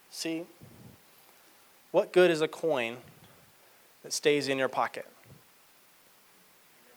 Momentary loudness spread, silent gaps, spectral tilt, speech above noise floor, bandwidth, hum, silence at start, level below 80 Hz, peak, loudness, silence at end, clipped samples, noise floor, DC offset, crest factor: 25 LU; none; -4 dB/octave; 31 dB; over 20 kHz; none; 0.15 s; -80 dBFS; -10 dBFS; -29 LUFS; 1.6 s; under 0.1%; -60 dBFS; under 0.1%; 22 dB